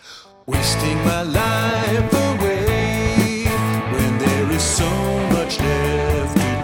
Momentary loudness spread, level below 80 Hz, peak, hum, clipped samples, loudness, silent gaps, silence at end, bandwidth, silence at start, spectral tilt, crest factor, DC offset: 2 LU; -30 dBFS; -2 dBFS; none; under 0.1%; -19 LUFS; none; 0 s; 18 kHz; 0.05 s; -5 dB/octave; 16 dB; under 0.1%